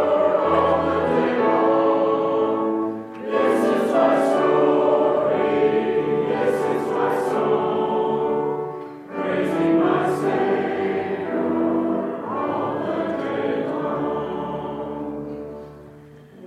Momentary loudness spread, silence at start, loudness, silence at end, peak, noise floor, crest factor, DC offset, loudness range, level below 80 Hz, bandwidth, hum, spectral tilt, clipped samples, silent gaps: 11 LU; 0 s; -21 LUFS; 0 s; -4 dBFS; -44 dBFS; 16 dB; under 0.1%; 6 LU; -56 dBFS; 13.5 kHz; none; -7 dB/octave; under 0.1%; none